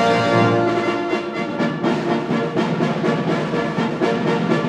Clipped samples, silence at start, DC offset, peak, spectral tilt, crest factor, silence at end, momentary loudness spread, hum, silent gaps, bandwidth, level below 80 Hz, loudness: under 0.1%; 0 s; under 0.1%; -4 dBFS; -6.5 dB/octave; 14 dB; 0 s; 6 LU; none; none; 11 kHz; -56 dBFS; -19 LUFS